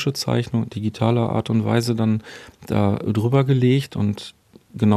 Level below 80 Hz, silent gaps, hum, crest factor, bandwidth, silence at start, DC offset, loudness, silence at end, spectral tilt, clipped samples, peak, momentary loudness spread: -54 dBFS; none; none; 18 dB; 14 kHz; 0 s; under 0.1%; -21 LUFS; 0 s; -7 dB/octave; under 0.1%; -2 dBFS; 12 LU